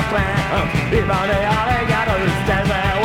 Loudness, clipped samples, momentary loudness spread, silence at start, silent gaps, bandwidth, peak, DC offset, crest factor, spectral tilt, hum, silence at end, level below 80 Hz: -18 LUFS; under 0.1%; 1 LU; 0 s; none; 17 kHz; -4 dBFS; under 0.1%; 12 dB; -6 dB/octave; none; 0 s; -30 dBFS